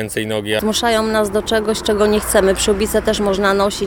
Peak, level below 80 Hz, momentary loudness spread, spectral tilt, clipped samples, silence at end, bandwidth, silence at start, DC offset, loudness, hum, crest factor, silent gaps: -2 dBFS; -34 dBFS; 4 LU; -3.5 dB/octave; under 0.1%; 0 s; 18.5 kHz; 0 s; under 0.1%; -16 LUFS; none; 14 dB; none